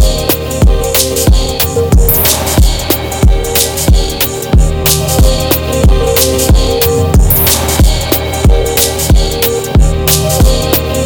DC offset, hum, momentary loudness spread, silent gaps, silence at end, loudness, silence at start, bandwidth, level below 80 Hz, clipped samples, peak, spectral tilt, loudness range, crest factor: under 0.1%; none; 4 LU; none; 0 s; -10 LUFS; 0 s; over 20 kHz; -12 dBFS; under 0.1%; 0 dBFS; -4 dB/octave; 1 LU; 8 dB